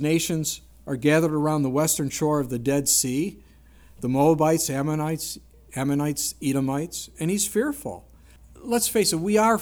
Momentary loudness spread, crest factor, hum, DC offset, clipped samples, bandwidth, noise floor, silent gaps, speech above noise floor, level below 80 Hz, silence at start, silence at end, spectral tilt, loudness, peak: 13 LU; 16 dB; none; under 0.1%; under 0.1%; over 20 kHz; -51 dBFS; none; 28 dB; -52 dBFS; 0 s; 0 s; -4.5 dB/octave; -24 LUFS; -8 dBFS